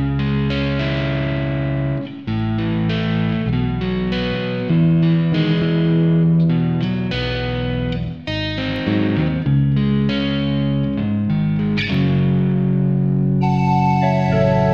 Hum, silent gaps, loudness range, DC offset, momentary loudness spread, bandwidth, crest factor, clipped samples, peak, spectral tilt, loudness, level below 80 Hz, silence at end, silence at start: none; none; 3 LU; 0.3%; 6 LU; 6.6 kHz; 14 dB; under 0.1%; -4 dBFS; -8.5 dB/octave; -18 LUFS; -36 dBFS; 0 s; 0 s